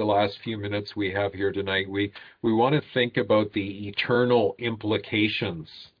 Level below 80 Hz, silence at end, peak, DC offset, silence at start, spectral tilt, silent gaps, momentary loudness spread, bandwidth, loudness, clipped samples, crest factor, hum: -62 dBFS; 0.15 s; -8 dBFS; under 0.1%; 0 s; -8 dB/octave; none; 8 LU; 5.2 kHz; -25 LUFS; under 0.1%; 16 dB; none